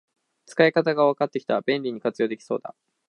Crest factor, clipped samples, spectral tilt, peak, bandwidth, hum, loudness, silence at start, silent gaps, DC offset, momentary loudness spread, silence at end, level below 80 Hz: 20 dB; under 0.1%; -6 dB/octave; -4 dBFS; 10.5 kHz; none; -24 LUFS; 0.5 s; none; under 0.1%; 12 LU; 0.4 s; -76 dBFS